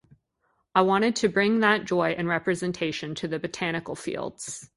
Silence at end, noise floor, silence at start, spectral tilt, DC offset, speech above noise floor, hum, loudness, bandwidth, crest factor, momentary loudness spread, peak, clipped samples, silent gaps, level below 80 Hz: 0.1 s; -73 dBFS; 0.75 s; -4.5 dB/octave; under 0.1%; 47 dB; none; -25 LUFS; 11.5 kHz; 20 dB; 11 LU; -6 dBFS; under 0.1%; none; -62 dBFS